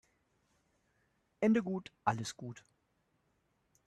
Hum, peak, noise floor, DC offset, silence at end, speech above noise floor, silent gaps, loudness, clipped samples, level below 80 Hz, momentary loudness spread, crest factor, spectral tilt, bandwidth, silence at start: none; -16 dBFS; -78 dBFS; under 0.1%; 1.3 s; 43 dB; none; -35 LUFS; under 0.1%; -76 dBFS; 17 LU; 24 dB; -6 dB/octave; 12 kHz; 1.4 s